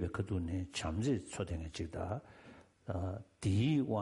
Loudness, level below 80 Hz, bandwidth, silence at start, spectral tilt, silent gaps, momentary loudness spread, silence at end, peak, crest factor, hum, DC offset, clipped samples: -38 LUFS; -54 dBFS; 11.5 kHz; 0 s; -6.5 dB/octave; none; 12 LU; 0 s; -24 dBFS; 14 dB; none; under 0.1%; under 0.1%